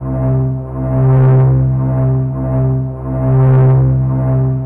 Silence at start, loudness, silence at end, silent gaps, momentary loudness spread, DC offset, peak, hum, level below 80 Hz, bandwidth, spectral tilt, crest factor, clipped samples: 0 s; -13 LUFS; 0 s; none; 8 LU; under 0.1%; -4 dBFS; none; -28 dBFS; 2.4 kHz; -13 dB/octave; 6 dB; under 0.1%